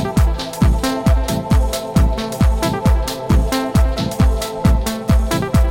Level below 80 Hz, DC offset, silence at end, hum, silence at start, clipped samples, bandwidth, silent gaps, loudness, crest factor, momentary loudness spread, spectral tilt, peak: -18 dBFS; under 0.1%; 0 s; none; 0 s; under 0.1%; 17 kHz; none; -17 LUFS; 14 dB; 2 LU; -6 dB/octave; -2 dBFS